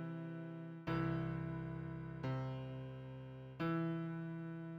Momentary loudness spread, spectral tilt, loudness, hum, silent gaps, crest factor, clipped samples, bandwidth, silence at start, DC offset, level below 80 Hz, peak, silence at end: 10 LU; -9 dB/octave; -44 LUFS; none; none; 16 dB; under 0.1%; 5.8 kHz; 0 s; under 0.1%; -64 dBFS; -28 dBFS; 0 s